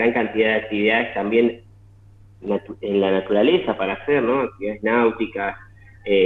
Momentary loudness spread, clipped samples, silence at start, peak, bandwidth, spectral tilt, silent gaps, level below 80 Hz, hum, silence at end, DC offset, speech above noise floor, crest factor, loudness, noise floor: 9 LU; under 0.1%; 0 s; -6 dBFS; 4.2 kHz; -8 dB/octave; none; -54 dBFS; none; 0 s; under 0.1%; 28 dB; 16 dB; -21 LUFS; -48 dBFS